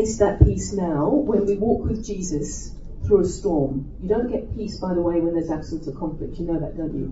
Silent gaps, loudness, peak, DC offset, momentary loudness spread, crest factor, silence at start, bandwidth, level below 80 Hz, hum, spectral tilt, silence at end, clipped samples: none; -23 LUFS; 0 dBFS; under 0.1%; 11 LU; 22 dB; 0 s; 8 kHz; -32 dBFS; none; -7.5 dB/octave; 0 s; under 0.1%